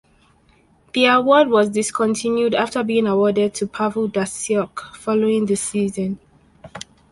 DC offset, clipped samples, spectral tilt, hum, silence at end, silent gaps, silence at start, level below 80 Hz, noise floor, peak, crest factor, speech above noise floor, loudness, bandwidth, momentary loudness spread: under 0.1%; under 0.1%; -4.5 dB/octave; none; 0.3 s; none; 0.95 s; -58 dBFS; -56 dBFS; -2 dBFS; 18 dB; 38 dB; -19 LUFS; 11.5 kHz; 15 LU